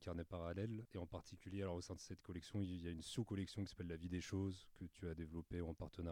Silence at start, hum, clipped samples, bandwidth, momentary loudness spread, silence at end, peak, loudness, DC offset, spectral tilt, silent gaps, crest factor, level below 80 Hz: 0 s; none; under 0.1%; 16 kHz; 7 LU; 0 s; -32 dBFS; -49 LUFS; under 0.1%; -6.5 dB/octave; none; 16 dB; -66 dBFS